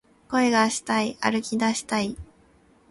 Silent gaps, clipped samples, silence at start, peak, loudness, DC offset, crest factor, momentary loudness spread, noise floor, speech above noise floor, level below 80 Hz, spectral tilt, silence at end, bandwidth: none; under 0.1%; 0.3 s; -6 dBFS; -24 LUFS; under 0.1%; 20 dB; 7 LU; -58 dBFS; 34 dB; -54 dBFS; -3.5 dB/octave; 0.65 s; 11.5 kHz